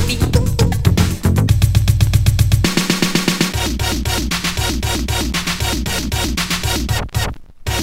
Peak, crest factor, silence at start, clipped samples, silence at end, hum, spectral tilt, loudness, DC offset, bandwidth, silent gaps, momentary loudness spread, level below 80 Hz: 0 dBFS; 16 dB; 0 s; under 0.1%; 0 s; none; -4.5 dB/octave; -17 LUFS; under 0.1%; 16.5 kHz; none; 5 LU; -24 dBFS